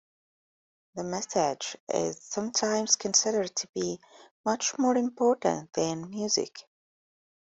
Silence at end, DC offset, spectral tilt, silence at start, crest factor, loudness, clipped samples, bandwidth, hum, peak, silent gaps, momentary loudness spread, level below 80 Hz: 0.85 s; under 0.1%; -2.5 dB/octave; 0.95 s; 22 dB; -28 LUFS; under 0.1%; 8.2 kHz; none; -8 dBFS; 1.80-1.87 s, 3.69-3.73 s, 4.31-4.44 s; 11 LU; -72 dBFS